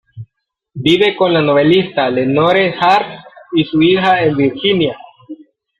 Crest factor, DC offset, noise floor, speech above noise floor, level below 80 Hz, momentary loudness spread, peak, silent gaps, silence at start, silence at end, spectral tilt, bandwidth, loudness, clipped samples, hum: 14 dB; under 0.1%; -70 dBFS; 58 dB; -52 dBFS; 8 LU; 0 dBFS; none; 0.15 s; 0.45 s; -7 dB/octave; 10 kHz; -13 LUFS; under 0.1%; none